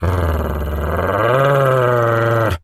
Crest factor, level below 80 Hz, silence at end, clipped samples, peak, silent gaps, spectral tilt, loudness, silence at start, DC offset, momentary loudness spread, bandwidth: 14 dB; -28 dBFS; 0.05 s; under 0.1%; -2 dBFS; none; -7 dB/octave; -16 LUFS; 0 s; under 0.1%; 7 LU; 15 kHz